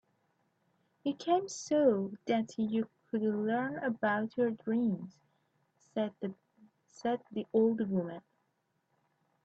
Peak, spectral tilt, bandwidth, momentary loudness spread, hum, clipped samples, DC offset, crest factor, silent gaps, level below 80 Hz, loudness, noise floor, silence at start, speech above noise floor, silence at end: -16 dBFS; -6 dB/octave; 8 kHz; 11 LU; none; under 0.1%; under 0.1%; 18 dB; none; -78 dBFS; -33 LUFS; -79 dBFS; 1.05 s; 47 dB; 1.25 s